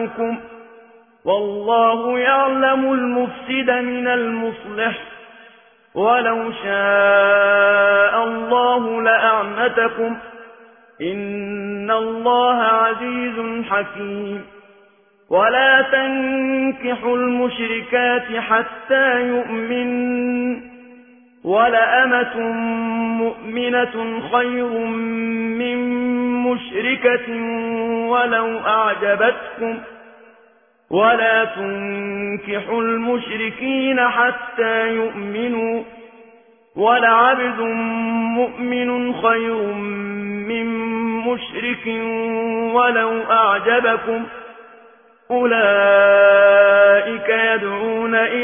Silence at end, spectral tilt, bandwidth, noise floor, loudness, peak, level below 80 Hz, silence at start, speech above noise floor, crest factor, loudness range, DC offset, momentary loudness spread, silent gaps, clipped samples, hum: 0 s; -8.5 dB/octave; 3.6 kHz; -54 dBFS; -18 LUFS; -2 dBFS; -60 dBFS; 0 s; 37 dB; 16 dB; 6 LU; under 0.1%; 12 LU; none; under 0.1%; none